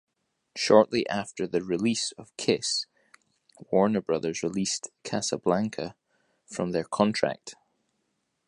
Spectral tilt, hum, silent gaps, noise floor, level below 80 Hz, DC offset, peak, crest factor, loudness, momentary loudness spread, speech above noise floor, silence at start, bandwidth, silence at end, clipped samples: -4 dB/octave; none; none; -77 dBFS; -66 dBFS; under 0.1%; -4 dBFS; 24 dB; -27 LUFS; 14 LU; 50 dB; 0.55 s; 11.5 kHz; 0.95 s; under 0.1%